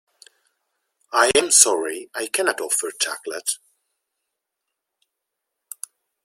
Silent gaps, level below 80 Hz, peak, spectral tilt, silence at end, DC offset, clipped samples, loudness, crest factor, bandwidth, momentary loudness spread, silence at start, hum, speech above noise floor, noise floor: none; -64 dBFS; 0 dBFS; 0.5 dB/octave; 2.7 s; under 0.1%; under 0.1%; -19 LUFS; 24 dB; 16.5 kHz; 23 LU; 1.1 s; none; 61 dB; -82 dBFS